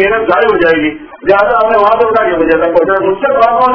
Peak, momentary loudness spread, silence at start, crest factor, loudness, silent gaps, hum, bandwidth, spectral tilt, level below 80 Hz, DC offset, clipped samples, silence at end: 0 dBFS; 3 LU; 0 s; 10 dB; -10 LUFS; none; none; 5.4 kHz; -7.5 dB/octave; -40 dBFS; under 0.1%; 1%; 0 s